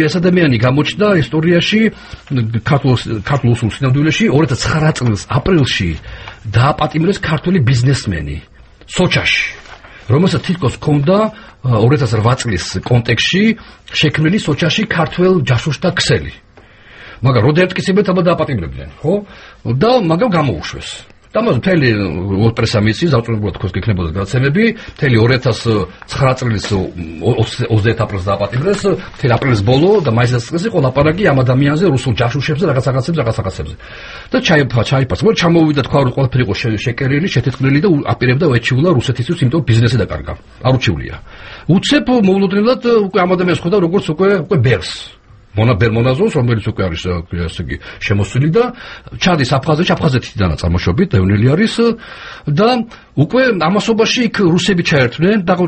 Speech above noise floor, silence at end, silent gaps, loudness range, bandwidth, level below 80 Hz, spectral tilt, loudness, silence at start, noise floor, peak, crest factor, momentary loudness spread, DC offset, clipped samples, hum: 28 dB; 0 s; none; 2 LU; 8.8 kHz; -36 dBFS; -6.5 dB/octave; -14 LUFS; 0 s; -41 dBFS; 0 dBFS; 14 dB; 9 LU; under 0.1%; under 0.1%; none